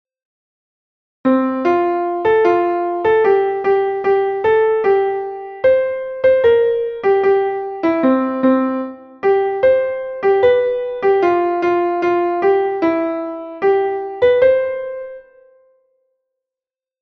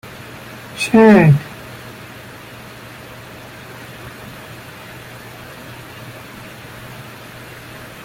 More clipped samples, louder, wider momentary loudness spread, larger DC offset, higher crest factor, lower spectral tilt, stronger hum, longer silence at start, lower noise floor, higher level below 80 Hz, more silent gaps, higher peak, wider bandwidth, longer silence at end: neither; second, -16 LUFS vs -11 LUFS; second, 8 LU vs 24 LU; neither; about the same, 14 dB vs 18 dB; about the same, -7 dB/octave vs -7 dB/octave; neither; first, 1.25 s vs 0.75 s; first, -90 dBFS vs -36 dBFS; about the same, -54 dBFS vs -50 dBFS; neither; about the same, -2 dBFS vs -2 dBFS; second, 6.2 kHz vs 16.5 kHz; second, 1.8 s vs 1.95 s